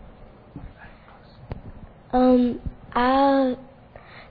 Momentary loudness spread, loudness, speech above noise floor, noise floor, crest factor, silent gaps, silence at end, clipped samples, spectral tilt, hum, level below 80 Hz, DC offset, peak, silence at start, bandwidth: 25 LU; -21 LUFS; 28 dB; -48 dBFS; 16 dB; none; 0.1 s; under 0.1%; -9 dB/octave; none; -44 dBFS; under 0.1%; -8 dBFS; 0.05 s; 4.9 kHz